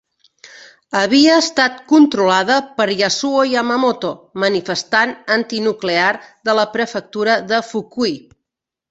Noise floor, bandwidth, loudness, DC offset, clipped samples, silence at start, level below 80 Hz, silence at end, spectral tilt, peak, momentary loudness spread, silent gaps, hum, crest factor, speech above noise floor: -81 dBFS; 8 kHz; -16 LUFS; under 0.1%; under 0.1%; 0.45 s; -62 dBFS; 0.7 s; -3.5 dB/octave; 0 dBFS; 9 LU; none; none; 16 dB; 66 dB